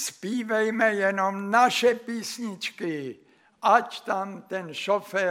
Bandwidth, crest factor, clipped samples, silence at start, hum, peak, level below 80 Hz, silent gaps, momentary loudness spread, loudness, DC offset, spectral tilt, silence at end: 16.5 kHz; 20 dB; under 0.1%; 0 s; none; -6 dBFS; -80 dBFS; none; 12 LU; -25 LUFS; under 0.1%; -3.5 dB/octave; 0 s